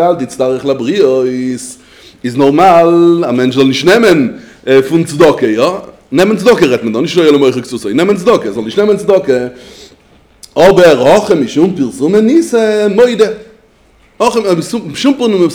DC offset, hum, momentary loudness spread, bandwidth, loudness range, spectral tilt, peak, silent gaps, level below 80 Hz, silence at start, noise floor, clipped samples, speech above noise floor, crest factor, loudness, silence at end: under 0.1%; none; 10 LU; over 20 kHz; 3 LU; -5.5 dB/octave; 0 dBFS; none; -46 dBFS; 0 s; -46 dBFS; 2%; 37 dB; 10 dB; -10 LUFS; 0 s